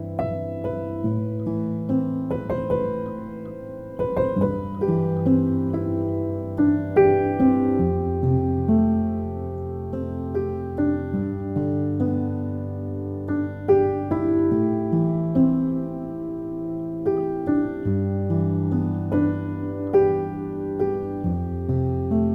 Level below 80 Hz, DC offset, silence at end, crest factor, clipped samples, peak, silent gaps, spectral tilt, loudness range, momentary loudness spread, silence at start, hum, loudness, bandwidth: -44 dBFS; under 0.1%; 0 s; 18 dB; under 0.1%; -6 dBFS; none; -11.5 dB/octave; 5 LU; 10 LU; 0 s; none; -24 LUFS; 4 kHz